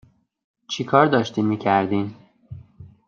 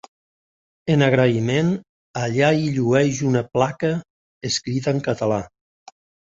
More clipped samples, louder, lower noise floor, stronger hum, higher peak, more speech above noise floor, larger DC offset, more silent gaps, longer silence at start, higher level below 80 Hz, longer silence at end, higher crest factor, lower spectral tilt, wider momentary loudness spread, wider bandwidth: neither; about the same, -20 LUFS vs -20 LUFS; second, -45 dBFS vs under -90 dBFS; neither; about the same, -2 dBFS vs -2 dBFS; second, 25 dB vs over 71 dB; neither; second, none vs 1.89-2.14 s, 4.10-4.41 s; second, 0.7 s vs 0.85 s; second, -60 dBFS vs -54 dBFS; second, 0.2 s vs 0.85 s; about the same, 20 dB vs 18 dB; about the same, -6 dB/octave vs -6 dB/octave; first, 25 LU vs 12 LU; about the same, 7.4 kHz vs 8 kHz